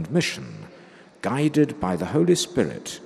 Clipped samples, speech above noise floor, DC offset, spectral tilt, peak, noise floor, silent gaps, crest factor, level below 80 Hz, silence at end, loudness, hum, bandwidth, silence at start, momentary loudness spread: under 0.1%; 25 dB; under 0.1%; -5.5 dB/octave; -6 dBFS; -48 dBFS; none; 18 dB; -56 dBFS; 0 s; -23 LUFS; none; 14.5 kHz; 0 s; 14 LU